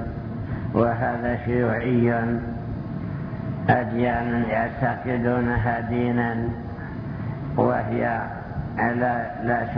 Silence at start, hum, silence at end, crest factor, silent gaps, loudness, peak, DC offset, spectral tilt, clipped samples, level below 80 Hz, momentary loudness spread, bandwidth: 0 s; none; 0 s; 18 dB; none; -25 LUFS; -6 dBFS; under 0.1%; -11 dB/octave; under 0.1%; -42 dBFS; 10 LU; 5.4 kHz